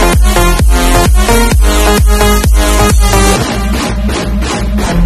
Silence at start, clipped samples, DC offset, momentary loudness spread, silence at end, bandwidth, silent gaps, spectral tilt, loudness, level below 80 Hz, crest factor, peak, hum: 0 s; 0.4%; under 0.1%; 6 LU; 0 s; 14 kHz; none; -4.5 dB/octave; -10 LUFS; -10 dBFS; 8 dB; 0 dBFS; none